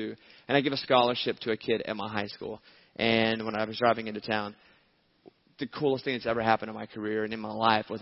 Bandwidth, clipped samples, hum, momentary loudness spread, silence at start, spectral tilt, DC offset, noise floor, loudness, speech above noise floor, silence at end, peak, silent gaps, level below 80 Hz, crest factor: 6 kHz; under 0.1%; none; 14 LU; 0 s; -8 dB/octave; under 0.1%; -67 dBFS; -29 LUFS; 38 dB; 0 s; -6 dBFS; none; -66 dBFS; 22 dB